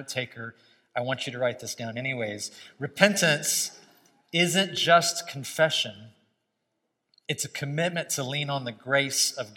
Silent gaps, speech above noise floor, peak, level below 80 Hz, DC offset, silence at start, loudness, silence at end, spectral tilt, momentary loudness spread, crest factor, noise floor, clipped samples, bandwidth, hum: none; 52 dB; 0 dBFS; -80 dBFS; under 0.1%; 0 s; -26 LUFS; 0 s; -2.5 dB/octave; 15 LU; 28 dB; -79 dBFS; under 0.1%; 16.5 kHz; none